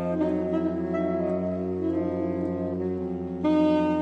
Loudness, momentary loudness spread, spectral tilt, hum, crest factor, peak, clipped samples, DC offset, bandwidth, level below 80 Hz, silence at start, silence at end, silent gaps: -27 LUFS; 7 LU; -9.5 dB/octave; none; 14 dB; -12 dBFS; under 0.1%; under 0.1%; 6.2 kHz; -56 dBFS; 0 s; 0 s; none